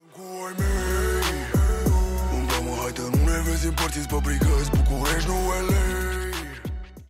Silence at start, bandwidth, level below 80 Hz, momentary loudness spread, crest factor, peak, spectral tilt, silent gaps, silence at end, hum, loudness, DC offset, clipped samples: 0.15 s; 16 kHz; -26 dBFS; 9 LU; 10 dB; -12 dBFS; -5 dB/octave; none; 0.05 s; none; -24 LUFS; under 0.1%; under 0.1%